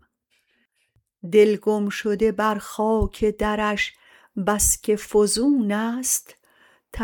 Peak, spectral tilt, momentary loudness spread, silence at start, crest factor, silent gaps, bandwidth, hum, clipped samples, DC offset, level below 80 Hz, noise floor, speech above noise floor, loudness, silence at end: -6 dBFS; -3.5 dB/octave; 7 LU; 1.25 s; 18 dB; none; 19 kHz; none; under 0.1%; under 0.1%; -40 dBFS; -69 dBFS; 48 dB; -21 LUFS; 0 s